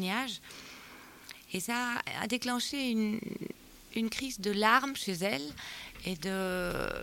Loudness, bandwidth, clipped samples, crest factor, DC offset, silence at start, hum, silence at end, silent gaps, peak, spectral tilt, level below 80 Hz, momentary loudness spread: -33 LUFS; 17 kHz; under 0.1%; 22 dB; under 0.1%; 0 s; none; 0 s; none; -12 dBFS; -3.5 dB/octave; -58 dBFS; 19 LU